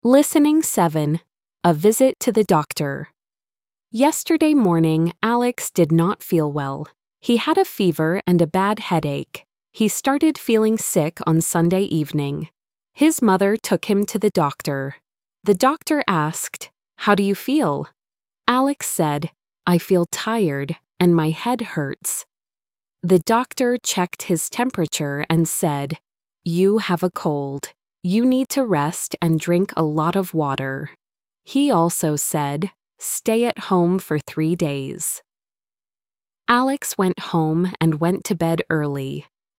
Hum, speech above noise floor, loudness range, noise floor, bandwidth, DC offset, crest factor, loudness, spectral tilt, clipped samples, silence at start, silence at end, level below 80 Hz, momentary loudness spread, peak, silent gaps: none; over 71 dB; 3 LU; under -90 dBFS; 16.5 kHz; under 0.1%; 18 dB; -20 LUFS; -5.5 dB/octave; under 0.1%; 0.05 s; 0.4 s; -60 dBFS; 11 LU; -2 dBFS; none